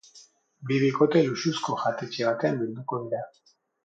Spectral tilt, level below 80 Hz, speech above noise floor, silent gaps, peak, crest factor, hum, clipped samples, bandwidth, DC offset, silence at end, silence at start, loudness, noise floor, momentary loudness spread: -6 dB/octave; -72 dBFS; 30 dB; none; -8 dBFS; 18 dB; none; under 0.1%; 9 kHz; under 0.1%; 0.55 s; 0.15 s; -26 LUFS; -56 dBFS; 12 LU